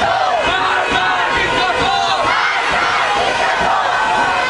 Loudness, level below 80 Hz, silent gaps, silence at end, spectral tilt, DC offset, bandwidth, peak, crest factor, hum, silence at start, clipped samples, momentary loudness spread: -14 LUFS; -40 dBFS; none; 0 s; -2.5 dB/octave; under 0.1%; 11 kHz; -2 dBFS; 14 dB; none; 0 s; under 0.1%; 1 LU